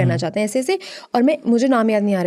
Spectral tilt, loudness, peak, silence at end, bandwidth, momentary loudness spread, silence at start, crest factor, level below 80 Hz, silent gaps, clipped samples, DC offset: -6.5 dB/octave; -18 LUFS; -4 dBFS; 0 s; 13.5 kHz; 7 LU; 0 s; 12 dB; -66 dBFS; none; under 0.1%; under 0.1%